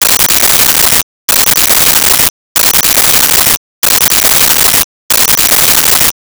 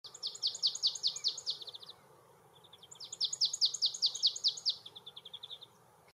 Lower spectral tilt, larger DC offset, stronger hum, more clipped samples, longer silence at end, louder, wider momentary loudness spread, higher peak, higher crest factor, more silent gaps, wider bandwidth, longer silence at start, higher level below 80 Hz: first, 0 dB/octave vs 2 dB/octave; first, 0.2% vs under 0.1%; neither; neither; second, 0.25 s vs 0.5 s; first, -5 LUFS vs -32 LUFS; second, 5 LU vs 19 LU; first, 0 dBFS vs -18 dBFS; second, 8 dB vs 20 dB; first, 1.03-1.28 s, 2.30-2.55 s, 3.57-3.82 s, 4.84-5.09 s vs none; first, over 20 kHz vs 15.5 kHz; about the same, 0 s vs 0.05 s; first, -34 dBFS vs -88 dBFS